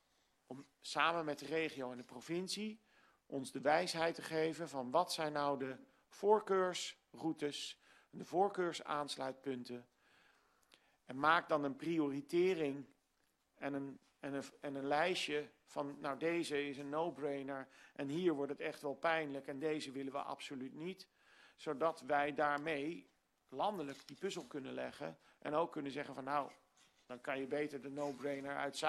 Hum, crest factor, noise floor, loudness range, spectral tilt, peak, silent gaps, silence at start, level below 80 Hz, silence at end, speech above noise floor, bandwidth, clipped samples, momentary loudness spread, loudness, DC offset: none; 24 dB; -81 dBFS; 5 LU; -4.5 dB/octave; -18 dBFS; none; 0.5 s; -82 dBFS; 0 s; 41 dB; 13 kHz; under 0.1%; 14 LU; -40 LUFS; under 0.1%